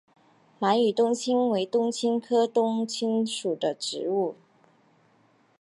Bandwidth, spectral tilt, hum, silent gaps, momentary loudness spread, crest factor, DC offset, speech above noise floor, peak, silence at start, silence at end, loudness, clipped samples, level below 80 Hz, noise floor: 11.5 kHz; -4.5 dB/octave; none; none; 6 LU; 16 dB; under 0.1%; 38 dB; -10 dBFS; 0.6 s; 1.3 s; -26 LUFS; under 0.1%; -84 dBFS; -63 dBFS